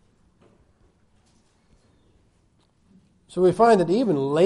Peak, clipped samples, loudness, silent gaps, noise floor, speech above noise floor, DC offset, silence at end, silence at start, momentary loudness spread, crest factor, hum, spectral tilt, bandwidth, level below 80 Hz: -6 dBFS; under 0.1%; -20 LUFS; none; -63 dBFS; 45 dB; under 0.1%; 0 s; 3.35 s; 5 LU; 18 dB; none; -7 dB/octave; 11 kHz; -60 dBFS